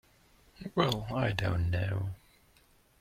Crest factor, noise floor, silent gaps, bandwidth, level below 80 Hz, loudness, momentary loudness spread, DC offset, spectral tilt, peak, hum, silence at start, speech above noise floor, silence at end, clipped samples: 22 dB; -65 dBFS; none; 16 kHz; -52 dBFS; -32 LUFS; 12 LU; under 0.1%; -6.5 dB/octave; -12 dBFS; none; 0.6 s; 34 dB; 0.85 s; under 0.1%